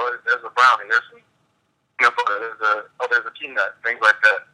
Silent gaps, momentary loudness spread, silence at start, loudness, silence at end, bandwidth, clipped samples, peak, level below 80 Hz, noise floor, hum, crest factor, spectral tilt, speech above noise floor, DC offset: none; 9 LU; 0 s; -19 LUFS; 0.1 s; 11.5 kHz; under 0.1%; -2 dBFS; -80 dBFS; -68 dBFS; none; 18 dB; 0 dB/octave; 48 dB; under 0.1%